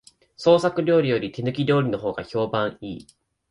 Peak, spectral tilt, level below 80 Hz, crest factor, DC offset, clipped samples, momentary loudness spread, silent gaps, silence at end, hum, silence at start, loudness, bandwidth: -6 dBFS; -7 dB/octave; -58 dBFS; 18 dB; under 0.1%; under 0.1%; 12 LU; none; 0.55 s; none; 0.4 s; -22 LUFS; 11 kHz